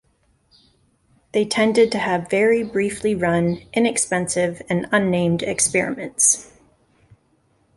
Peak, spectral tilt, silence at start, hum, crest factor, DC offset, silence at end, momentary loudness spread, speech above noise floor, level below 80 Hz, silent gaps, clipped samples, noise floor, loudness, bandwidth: -2 dBFS; -4 dB/octave; 1.35 s; none; 18 dB; under 0.1%; 1.3 s; 6 LU; 43 dB; -54 dBFS; none; under 0.1%; -63 dBFS; -19 LUFS; 12 kHz